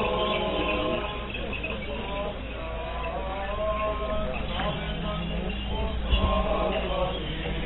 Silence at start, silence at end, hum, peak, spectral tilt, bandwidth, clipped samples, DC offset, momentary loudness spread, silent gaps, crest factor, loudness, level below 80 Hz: 0 s; 0 s; none; -10 dBFS; -10 dB/octave; 4.1 kHz; under 0.1%; under 0.1%; 7 LU; none; 18 dB; -29 LUFS; -34 dBFS